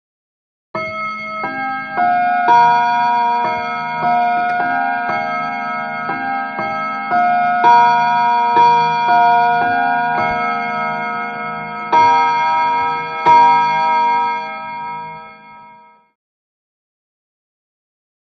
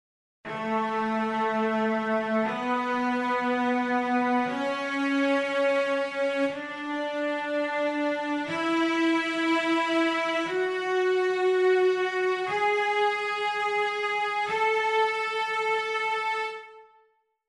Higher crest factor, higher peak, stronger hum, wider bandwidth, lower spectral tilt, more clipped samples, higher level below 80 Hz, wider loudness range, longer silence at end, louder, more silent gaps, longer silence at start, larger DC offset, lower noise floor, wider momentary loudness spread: about the same, 16 dB vs 12 dB; first, 0 dBFS vs -14 dBFS; neither; second, 6.4 kHz vs 11.5 kHz; about the same, -5 dB/octave vs -4 dB/octave; neither; first, -56 dBFS vs -72 dBFS; first, 6 LU vs 2 LU; first, 2.65 s vs 0.65 s; first, -15 LUFS vs -26 LUFS; neither; first, 0.75 s vs 0.45 s; neither; second, -44 dBFS vs -67 dBFS; first, 12 LU vs 5 LU